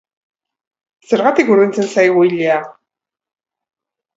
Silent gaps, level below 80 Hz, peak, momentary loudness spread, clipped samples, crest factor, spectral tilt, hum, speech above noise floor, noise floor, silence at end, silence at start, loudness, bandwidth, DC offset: none; -66 dBFS; 0 dBFS; 6 LU; under 0.1%; 16 dB; -6 dB/octave; none; 71 dB; -83 dBFS; 1.45 s; 1.1 s; -13 LUFS; 8 kHz; under 0.1%